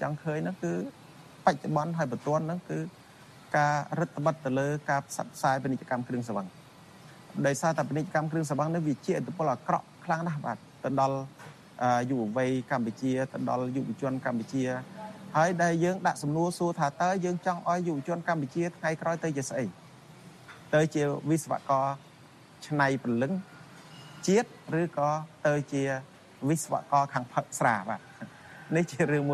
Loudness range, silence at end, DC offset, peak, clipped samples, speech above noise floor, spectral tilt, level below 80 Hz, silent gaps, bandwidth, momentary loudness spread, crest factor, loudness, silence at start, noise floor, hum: 3 LU; 0 s; under 0.1%; -8 dBFS; under 0.1%; 24 dB; -6 dB/octave; -70 dBFS; none; 13 kHz; 10 LU; 22 dB; -30 LUFS; 0 s; -53 dBFS; none